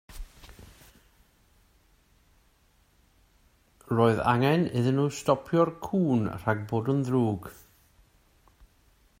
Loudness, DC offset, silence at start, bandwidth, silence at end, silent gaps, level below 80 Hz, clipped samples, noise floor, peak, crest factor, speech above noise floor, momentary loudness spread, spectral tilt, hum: -26 LUFS; under 0.1%; 0.1 s; 16 kHz; 1.7 s; none; -54 dBFS; under 0.1%; -65 dBFS; -8 dBFS; 22 dB; 39 dB; 13 LU; -7 dB/octave; none